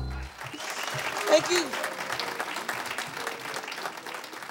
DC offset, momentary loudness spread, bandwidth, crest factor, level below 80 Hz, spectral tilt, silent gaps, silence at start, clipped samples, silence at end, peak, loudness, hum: under 0.1%; 14 LU; over 20 kHz; 24 dB; -48 dBFS; -2.5 dB/octave; none; 0 s; under 0.1%; 0 s; -8 dBFS; -30 LUFS; none